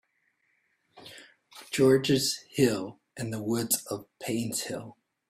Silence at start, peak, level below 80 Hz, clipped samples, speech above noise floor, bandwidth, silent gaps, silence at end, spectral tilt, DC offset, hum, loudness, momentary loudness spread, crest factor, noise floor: 0.95 s; -10 dBFS; -66 dBFS; under 0.1%; 46 dB; 16 kHz; none; 0.35 s; -4 dB/octave; under 0.1%; none; -28 LUFS; 20 LU; 20 dB; -73 dBFS